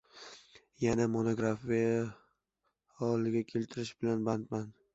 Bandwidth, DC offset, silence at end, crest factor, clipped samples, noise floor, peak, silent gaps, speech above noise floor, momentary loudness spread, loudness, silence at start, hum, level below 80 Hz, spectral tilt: 8 kHz; under 0.1%; 0.25 s; 18 dB; under 0.1%; -83 dBFS; -16 dBFS; none; 50 dB; 10 LU; -34 LUFS; 0.15 s; none; -64 dBFS; -7 dB/octave